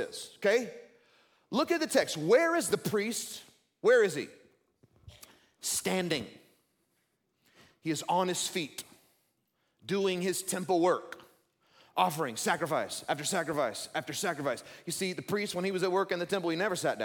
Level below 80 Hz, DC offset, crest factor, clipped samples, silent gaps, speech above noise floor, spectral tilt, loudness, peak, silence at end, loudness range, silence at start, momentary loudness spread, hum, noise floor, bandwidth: -76 dBFS; under 0.1%; 20 dB; under 0.1%; none; 47 dB; -3.5 dB/octave; -31 LUFS; -12 dBFS; 0 s; 7 LU; 0 s; 13 LU; none; -77 dBFS; 17.5 kHz